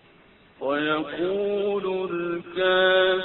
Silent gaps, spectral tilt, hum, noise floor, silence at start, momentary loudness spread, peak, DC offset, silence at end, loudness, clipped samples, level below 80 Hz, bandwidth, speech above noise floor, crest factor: none; -9 dB/octave; none; -55 dBFS; 0.6 s; 10 LU; -10 dBFS; under 0.1%; 0 s; -24 LUFS; under 0.1%; -62 dBFS; 4.2 kHz; 31 dB; 16 dB